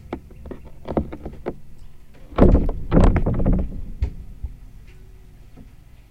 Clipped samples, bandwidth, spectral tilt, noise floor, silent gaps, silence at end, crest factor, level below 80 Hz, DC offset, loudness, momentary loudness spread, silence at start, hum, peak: under 0.1%; 8.6 kHz; -9.5 dB/octave; -44 dBFS; none; 0.45 s; 22 dB; -24 dBFS; under 0.1%; -22 LUFS; 21 LU; 0.1 s; none; 0 dBFS